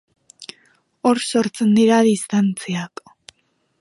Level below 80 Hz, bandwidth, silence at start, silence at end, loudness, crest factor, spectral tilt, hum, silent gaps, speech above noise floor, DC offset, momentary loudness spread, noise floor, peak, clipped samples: -68 dBFS; 11.5 kHz; 0.4 s; 0.95 s; -18 LUFS; 16 dB; -5.5 dB/octave; none; none; 49 dB; under 0.1%; 24 LU; -66 dBFS; -4 dBFS; under 0.1%